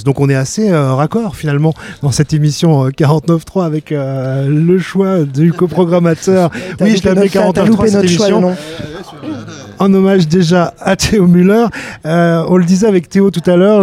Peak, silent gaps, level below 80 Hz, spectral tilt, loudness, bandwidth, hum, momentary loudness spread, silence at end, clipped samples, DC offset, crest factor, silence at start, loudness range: 0 dBFS; none; -40 dBFS; -6.5 dB/octave; -11 LUFS; 14 kHz; none; 8 LU; 0 s; under 0.1%; under 0.1%; 10 dB; 0 s; 2 LU